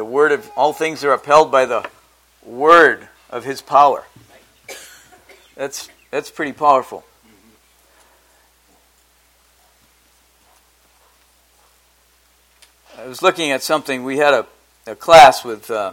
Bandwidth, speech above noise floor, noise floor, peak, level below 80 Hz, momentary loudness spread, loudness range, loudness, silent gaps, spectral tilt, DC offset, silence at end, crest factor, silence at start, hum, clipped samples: 17 kHz; 41 dB; -56 dBFS; 0 dBFS; -54 dBFS; 25 LU; 9 LU; -15 LUFS; none; -3 dB/octave; under 0.1%; 0 s; 18 dB; 0 s; none; 0.2%